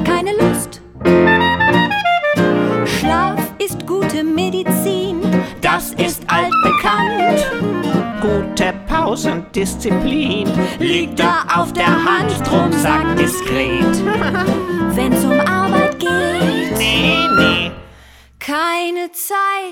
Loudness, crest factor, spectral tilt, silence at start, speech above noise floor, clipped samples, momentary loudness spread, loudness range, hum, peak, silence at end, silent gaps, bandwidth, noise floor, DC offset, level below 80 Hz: -15 LUFS; 16 dB; -5 dB/octave; 0 s; 28 dB; under 0.1%; 7 LU; 3 LU; none; 0 dBFS; 0 s; none; 19 kHz; -43 dBFS; under 0.1%; -36 dBFS